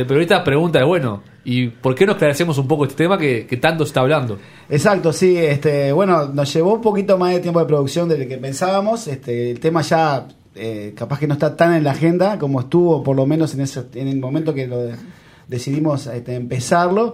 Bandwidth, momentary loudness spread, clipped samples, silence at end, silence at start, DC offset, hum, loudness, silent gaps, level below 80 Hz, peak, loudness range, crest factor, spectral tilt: 15.5 kHz; 10 LU; under 0.1%; 0 s; 0 s; under 0.1%; none; -17 LUFS; none; -56 dBFS; 0 dBFS; 4 LU; 16 dB; -6.5 dB/octave